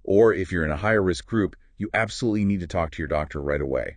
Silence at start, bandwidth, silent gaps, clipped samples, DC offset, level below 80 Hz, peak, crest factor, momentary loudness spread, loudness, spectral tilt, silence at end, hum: 0.05 s; 9.8 kHz; none; under 0.1%; under 0.1%; -42 dBFS; -6 dBFS; 18 dB; 8 LU; -24 LUFS; -6.5 dB/octave; 0 s; none